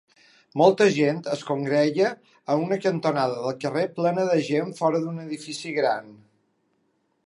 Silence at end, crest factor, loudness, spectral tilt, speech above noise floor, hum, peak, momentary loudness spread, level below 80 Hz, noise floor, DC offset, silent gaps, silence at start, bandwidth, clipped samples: 1.1 s; 20 dB; -24 LUFS; -6 dB/octave; 47 dB; none; -4 dBFS; 11 LU; -76 dBFS; -70 dBFS; under 0.1%; none; 0.55 s; 11.5 kHz; under 0.1%